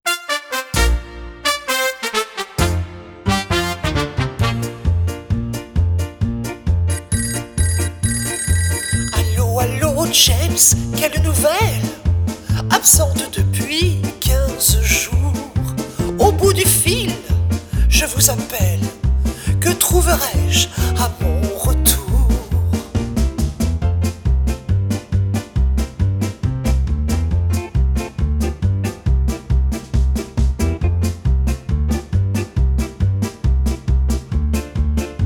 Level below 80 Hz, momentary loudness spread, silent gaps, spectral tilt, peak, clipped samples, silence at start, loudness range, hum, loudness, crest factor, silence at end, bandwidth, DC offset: -22 dBFS; 8 LU; none; -4 dB/octave; 0 dBFS; under 0.1%; 0.05 s; 5 LU; none; -18 LUFS; 16 dB; 0 s; over 20 kHz; under 0.1%